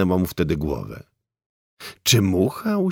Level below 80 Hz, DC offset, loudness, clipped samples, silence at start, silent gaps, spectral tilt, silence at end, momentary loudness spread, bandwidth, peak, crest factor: -42 dBFS; under 0.1%; -21 LUFS; under 0.1%; 0 s; 1.46-1.77 s; -5 dB/octave; 0 s; 22 LU; 19.5 kHz; -2 dBFS; 20 dB